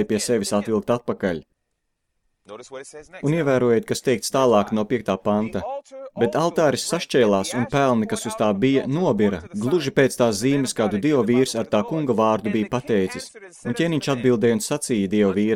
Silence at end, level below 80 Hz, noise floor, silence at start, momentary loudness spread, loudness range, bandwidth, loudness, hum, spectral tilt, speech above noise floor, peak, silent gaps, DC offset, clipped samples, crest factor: 0 s; -56 dBFS; -75 dBFS; 0 s; 11 LU; 4 LU; 16.5 kHz; -21 LUFS; none; -5.5 dB/octave; 54 dB; -4 dBFS; none; under 0.1%; under 0.1%; 18 dB